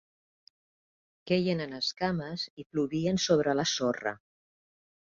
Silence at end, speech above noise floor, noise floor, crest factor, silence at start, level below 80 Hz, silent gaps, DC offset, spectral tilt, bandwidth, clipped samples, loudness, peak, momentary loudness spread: 0.95 s; over 60 dB; under -90 dBFS; 20 dB; 1.25 s; -66 dBFS; 2.50-2.57 s, 2.66-2.70 s; under 0.1%; -4.5 dB/octave; 7.6 kHz; under 0.1%; -30 LUFS; -12 dBFS; 10 LU